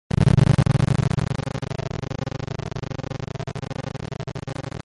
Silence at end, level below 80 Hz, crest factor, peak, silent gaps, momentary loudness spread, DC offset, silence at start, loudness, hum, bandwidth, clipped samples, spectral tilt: 0.05 s; -36 dBFS; 18 dB; -6 dBFS; none; 15 LU; under 0.1%; 0.15 s; -24 LUFS; none; 11.5 kHz; under 0.1%; -7 dB/octave